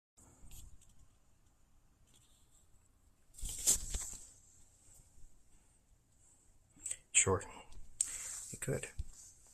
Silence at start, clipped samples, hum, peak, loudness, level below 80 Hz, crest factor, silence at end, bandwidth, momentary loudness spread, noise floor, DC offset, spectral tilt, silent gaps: 0.2 s; under 0.1%; none; -14 dBFS; -36 LUFS; -56 dBFS; 30 dB; 0 s; 15.5 kHz; 27 LU; -69 dBFS; under 0.1%; -2 dB/octave; none